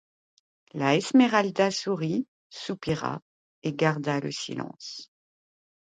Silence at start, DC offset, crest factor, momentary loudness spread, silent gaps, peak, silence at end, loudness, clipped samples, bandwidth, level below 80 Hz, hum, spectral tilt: 0.75 s; under 0.1%; 20 dB; 19 LU; 2.28-2.50 s, 3.22-3.62 s; -8 dBFS; 0.8 s; -26 LUFS; under 0.1%; 9.4 kHz; -66 dBFS; none; -5.5 dB/octave